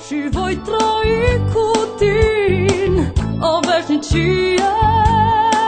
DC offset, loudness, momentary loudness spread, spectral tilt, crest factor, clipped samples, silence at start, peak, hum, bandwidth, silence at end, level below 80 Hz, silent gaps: under 0.1%; -16 LUFS; 6 LU; -5.5 dB/octave; 14 dB; under 0.1%; 0 s; 0 dBFS; none; 9.4 kHz; 0 s; -26 dBFS; none